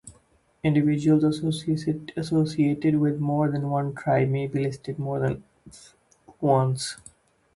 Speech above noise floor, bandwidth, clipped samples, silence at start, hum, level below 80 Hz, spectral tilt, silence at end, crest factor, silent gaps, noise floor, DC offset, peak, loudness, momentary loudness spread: 38 dB; 11.5 kHz; under 0.1%; 0.05 s; none; -58 dBFS; -7 dB/octave; 0.6 s; 18 dB; none; -62 dBFS; under 0.1%; -8 dBFS; -25 LUFS; 8 LU